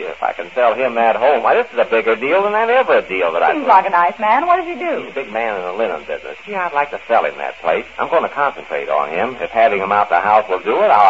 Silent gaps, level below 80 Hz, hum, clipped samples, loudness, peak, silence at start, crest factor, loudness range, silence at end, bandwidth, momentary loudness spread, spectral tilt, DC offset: none; -58 dBFS; none; under 0.1%; -16 LUFS; 0 dBFS; 0 s; 16 dB; 5 LU; 0 s; 7.8 kHz; 9 LU; -5 dB/octave; 0.4%